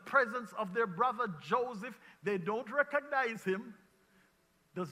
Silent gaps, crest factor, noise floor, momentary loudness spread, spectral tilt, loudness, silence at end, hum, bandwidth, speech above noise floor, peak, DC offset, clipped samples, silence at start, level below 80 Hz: none; 22 dB; -71 dBFS; 12 LU; -6 dB/octave; -35 LUFS; 0 s; none; 15 kHz; 37 dB; -14 dBFS; under 0.1%; under 0.1%; 0 s; -80 dBFS